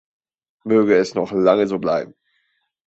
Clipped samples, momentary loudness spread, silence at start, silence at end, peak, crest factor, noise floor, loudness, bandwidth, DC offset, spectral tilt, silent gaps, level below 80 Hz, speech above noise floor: under 0.1%; 12 LU; 0.65 s; 0.8 s; -2 dBFS; 18 dB; -69 dBFS; -18 LUFS; 8 kHz; under 0.1%; -6.5 dB/octave; none; -60 dBFS; 51 dB